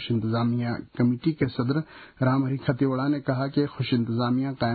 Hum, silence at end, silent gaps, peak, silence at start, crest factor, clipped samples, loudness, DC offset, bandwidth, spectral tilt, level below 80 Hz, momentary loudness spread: none; 0 s; none; -10 dBFS; 0 s; 14 dB; under 0.1%; -26 LUFS; under 0.1%; 4.8 kHz; -12 dB/octave; -56 dBFS; 3 LU